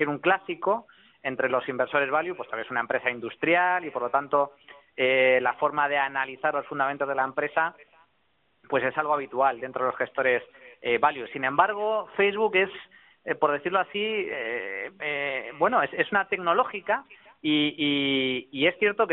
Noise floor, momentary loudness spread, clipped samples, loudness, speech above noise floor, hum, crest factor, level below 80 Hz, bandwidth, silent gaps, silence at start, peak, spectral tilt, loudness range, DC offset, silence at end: -70 dBFS; 7 LU; under 0.1%; -26 LUFS; 44 dB; none; 20 dB; -72 dBFS; 4.1 kHz; none; 0 s; -8 dBFS; -1.5 dB/octave; 3 LU; under 0.1%; 0 s